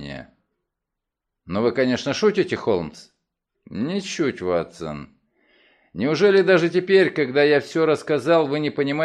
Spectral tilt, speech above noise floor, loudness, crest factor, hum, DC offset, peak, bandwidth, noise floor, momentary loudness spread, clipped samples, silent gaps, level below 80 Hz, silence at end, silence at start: -5.5 dB/octave; 63 dB; -20 LUFS; 18 dB; none; under 0.1%; -4 dBFS; 10.5 kHz; -83 dBFS; 16 LU; under 0.1%; none; -58 dBFS; 0 s; 0 s